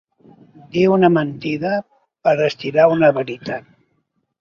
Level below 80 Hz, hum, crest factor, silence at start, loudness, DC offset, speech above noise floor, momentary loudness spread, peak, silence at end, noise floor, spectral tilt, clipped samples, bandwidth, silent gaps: -60 dBFS; none; 18 dB; 0.75 s; -17 LUFS; under 0.1%; 52 dB; 12 LU; 0 dBFS; 0.8 s; -68 dBFS; -7.5 dB/octave; under 0.1%; 7 kHz; none